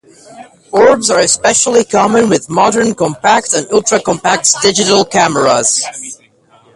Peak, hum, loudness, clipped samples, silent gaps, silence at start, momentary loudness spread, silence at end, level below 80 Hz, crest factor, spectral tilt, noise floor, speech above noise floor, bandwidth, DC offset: 0 dBFS; none; -10 LUFS; under 0.1%; none; 0.3 s; 5 LU; 0.6 s; -50 dBFS; 12 dB; -2.5 dB/octave; -48 dBFS; 37 dB; 12.5 kHz; under 0.1%